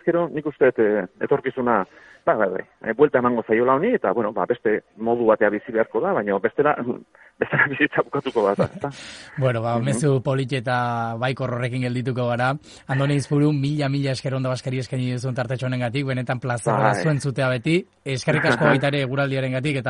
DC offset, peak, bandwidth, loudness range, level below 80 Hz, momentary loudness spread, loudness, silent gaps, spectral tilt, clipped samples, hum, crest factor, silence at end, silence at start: under 0.1%; -2 dBFS; 11.5 kHz; 3 LU; -60 dBFS; 8 LU; -22 LUFS; none; -6.5 dB/octave; under 0.1%; none; 20 dB; 0 s; 0.05 s